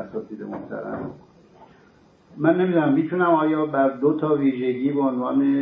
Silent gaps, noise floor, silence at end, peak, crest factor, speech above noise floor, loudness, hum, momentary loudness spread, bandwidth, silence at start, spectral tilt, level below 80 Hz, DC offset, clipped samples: none; -54 dBFS; 0 s; -4 dBFS; 18 dB; 33 dB; -22 LUFS; none; 14 LU; 3.9 kHz; 0 s; -10.5 dB/octave; -64 dBFS; under 0.1%; under 0.1%